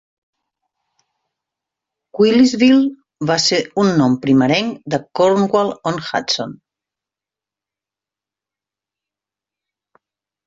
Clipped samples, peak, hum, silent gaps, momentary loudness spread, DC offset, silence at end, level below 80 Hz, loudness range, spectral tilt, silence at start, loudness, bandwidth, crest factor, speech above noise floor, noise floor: under 0.1%; -2 dBFS; none; none; 11 LU; under 0.1%; 3.95 s; -58 dBFS; 11 LU; -5 dB/octave; 2.15 s; -16 LUFS; 7.8 kHz; 16 dB; 73 dB; -88 dBFS